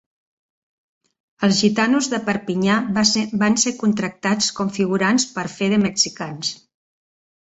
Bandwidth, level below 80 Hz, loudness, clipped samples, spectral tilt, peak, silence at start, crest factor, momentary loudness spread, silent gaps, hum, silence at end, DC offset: 8.2 kHz; -58 dBFS; -19 LUFS; under 0.1%; -3.5 dB/octave; -2 dBFS; 1.4 s; 18 dB; 7 LU; none; none; 0.9 s; under 0.1%